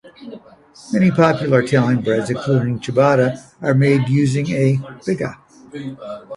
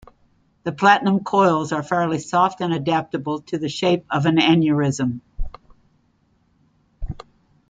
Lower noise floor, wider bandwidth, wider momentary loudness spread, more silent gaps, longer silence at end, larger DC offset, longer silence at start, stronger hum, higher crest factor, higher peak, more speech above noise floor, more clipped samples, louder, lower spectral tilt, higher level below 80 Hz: second, -38 dBFS vs -62 dBFS; first, 11.5 kHz vs 9.2 kHz; second, 17 LU vs 20 LU; neither; second, 0 s vs 0.5 s; neither; second, 0.05 s vs 0.65 s; neither; about the same, 18 dB vs 20 dB; about the same, 0 dBFS vs -2 dBFS; second, 21 dB vs 43 dB; neither; first, -17 LUFS vs -20 LUFS; first, -7.5 dB/octave vs -6 dB/octave; second, -54 dBFS vs -40 dBFS